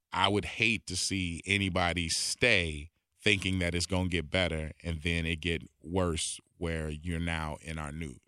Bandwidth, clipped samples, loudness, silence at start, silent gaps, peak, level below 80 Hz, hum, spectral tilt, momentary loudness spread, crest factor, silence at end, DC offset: 13.5 kHz; under 0.1%; -31 LUFS; 0.1 s; none; -8 dBFS; -46 dBFS; none; -3.5 dB/octave; 10 LU; 22 dB; 0.1 s; under 0.1%